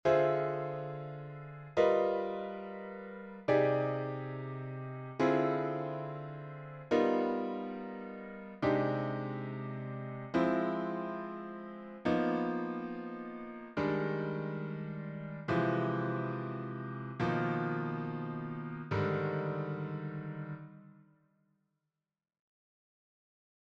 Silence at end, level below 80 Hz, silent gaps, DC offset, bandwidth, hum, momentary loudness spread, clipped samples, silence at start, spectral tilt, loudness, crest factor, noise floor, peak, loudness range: 2.7 s; -70 dBFS; none; under 0.1%; 7.6 kHz; none; 14 LU; under 0.1%; 0.05 s; -8.5 dB/octave; -35 LUFS; 20 dB; under -90 dBFS; -16 dBFS; 5 LU